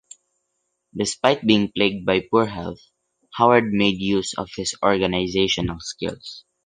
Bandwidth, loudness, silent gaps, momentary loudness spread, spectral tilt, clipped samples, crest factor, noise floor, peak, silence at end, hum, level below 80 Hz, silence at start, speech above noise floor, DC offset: 10 kHz; -21 LUFS; none; 14 LU; -4.5 dB/octave; under 0.1%; 20 dB; -75 dBFS; -2 dBFS; 0.25 s; none; -48 dBFS; 0.95 s; 54 dB; under 0.1%